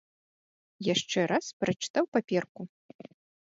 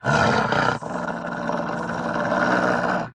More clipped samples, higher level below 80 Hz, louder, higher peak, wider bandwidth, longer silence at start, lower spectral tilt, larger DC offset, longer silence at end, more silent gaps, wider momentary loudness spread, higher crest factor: neither; second, -72 dBFS vs -48 dBFS; second, -30 LUFS vs -23 LUFS; second, -12 dBFS vs -4 dBFS; second, 7.8 kHz vs 11.5 kHz; first, 0.8 s vs 0.05 s; about the same, -4.5 dB/octave vs -5.5 dB/octave; neither; first, 0.85 s vs 0.05 s; first, 1.53-1.60 s, 1.90-1.94 s, 2.08-2.12 s, 2.49-2.55 s vs none; first, 14 LU vs 9 LU; about the same, 20 dB vs 18 dB